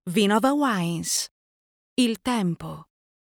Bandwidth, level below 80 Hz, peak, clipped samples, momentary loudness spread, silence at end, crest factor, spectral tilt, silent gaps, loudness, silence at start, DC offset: over 20 kHz; -60 dBFS; -8 dBFS; under 0.1%; 14 LU; 0.4 s; 16 dB; -4 dB/octave; 1.31-1.96 s; -24 LUFS; 0.05 s; under 0.1%